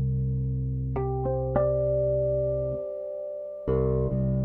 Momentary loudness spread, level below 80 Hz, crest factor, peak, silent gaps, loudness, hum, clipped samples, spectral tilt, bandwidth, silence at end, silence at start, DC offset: 9 LU; -36 dBFS; 16 dB; -10 dBFS; none; -28 LUFS; none; under 0.1%; -13.5 dB/octave; 2.5 kHz; 0 s; 0 s; under 0.1%